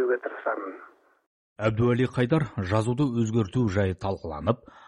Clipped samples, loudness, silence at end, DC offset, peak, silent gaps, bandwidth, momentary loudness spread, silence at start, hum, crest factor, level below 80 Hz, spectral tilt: under 0.1%; -27 LUFS; 0.1 s; under 0.1%; -8 dBFS; 1.26-1.56 s; 11 kHz; 8 LU; 0 s; none; 20 dB; -52 dBFS; -7.5 dB/octave